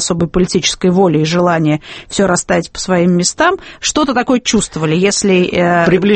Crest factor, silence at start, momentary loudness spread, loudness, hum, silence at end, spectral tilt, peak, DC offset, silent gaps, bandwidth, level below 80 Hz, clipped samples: 12 dB; 0 s; 5 LU; -13 LUFS; none; 0 s; -4.5 dB/octave; 0 dBFS; under 0.1%; none; 8.8 kHz; -38 dBFS; under 0.1%